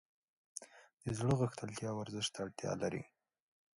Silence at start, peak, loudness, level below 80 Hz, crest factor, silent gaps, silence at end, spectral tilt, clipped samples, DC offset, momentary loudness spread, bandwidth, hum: 0.55 s; -20 dBFS; -40 LUFS; -66 dBFS; 20 dB; 0.93-0.97 s; 0.7 s; -5 dB/octave; under 0.1%; under 0.1%; 16 LU; 11.5 kHz; none